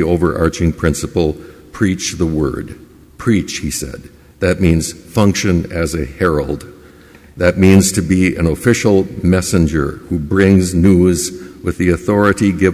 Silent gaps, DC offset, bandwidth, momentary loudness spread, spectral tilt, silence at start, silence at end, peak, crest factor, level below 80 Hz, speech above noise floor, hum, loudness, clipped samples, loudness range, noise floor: none; under 0.1%; 15.5 kHz; 11 LU; -6 dB/octave; 0 s; 0 s; 0 dBFS; 14 dB; -28 dBFS; 28 dB; none; -15 LUFS; under 0.1%; 5 LU; -41 dBFS